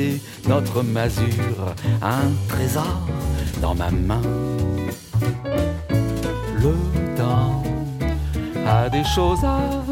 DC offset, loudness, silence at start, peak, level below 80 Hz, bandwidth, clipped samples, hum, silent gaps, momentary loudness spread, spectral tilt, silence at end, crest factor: under 0.1%; -22 LUFS; 0 s; -6 dBFS; -30 dBFS; 17 kHz; under 0.1%; none; none; 6 LU; -6.5 dB/octave; 0 s; 16 dB